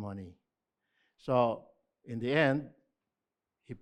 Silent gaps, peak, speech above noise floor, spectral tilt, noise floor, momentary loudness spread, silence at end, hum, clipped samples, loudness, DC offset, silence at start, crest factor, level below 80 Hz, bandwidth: none; -12 dBFS; 59 dB; -7.5 dB/octave; -90 dBFS; 22 LU; 0.05 s; none; under 0.1%; -31 LUFS; under 0.1%; 0 s; 22 dB; -72 dBFS; 9.4 kHz